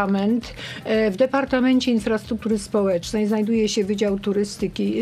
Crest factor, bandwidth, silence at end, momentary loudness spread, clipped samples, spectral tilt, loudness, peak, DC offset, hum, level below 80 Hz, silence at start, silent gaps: 14 dB; 13.5 kHz; 0 s; 6 LU; under 0.1%; -5.5 dB/octave; -22 LUFS; -8 dBFS; under 0.1%; none; -48 dBFS; 0 s; none